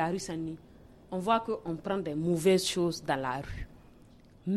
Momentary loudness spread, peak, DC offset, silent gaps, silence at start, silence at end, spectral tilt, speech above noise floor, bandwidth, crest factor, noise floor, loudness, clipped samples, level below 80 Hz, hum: 16 LU; -12 dBFS; under 0.1%; none; 0 s; 0 s; -5 dB/octave; 26 dB; 14 kHz; 20 dB; -56 dBFS; -31 LUFS; under 0.1%; -54 dBFS; none